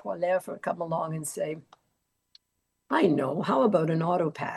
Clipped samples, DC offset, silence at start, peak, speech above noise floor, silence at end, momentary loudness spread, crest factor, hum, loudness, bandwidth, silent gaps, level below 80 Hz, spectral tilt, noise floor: under 0.1%; under 0.1%; 0.05 s; -10 dBFS; 52 dB; 0 s; 10 LU; 18 dB; none; -27 LUFS; 12.5 kHz; none; -74 dBFS; -6 dB/octave; -79 dBFS